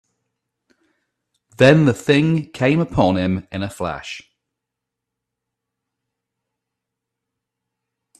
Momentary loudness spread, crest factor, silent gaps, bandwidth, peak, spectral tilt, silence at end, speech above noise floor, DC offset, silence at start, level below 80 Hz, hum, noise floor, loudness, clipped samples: 16 LU; 22 dB; none; 13 kHz; 0 dBFS; -7 dB/octave; 4 s; 66 dB; under 0.1%; 1.6 s; -50 dBFS; none; -82 dBFS; -17 LUFS; under 0.1%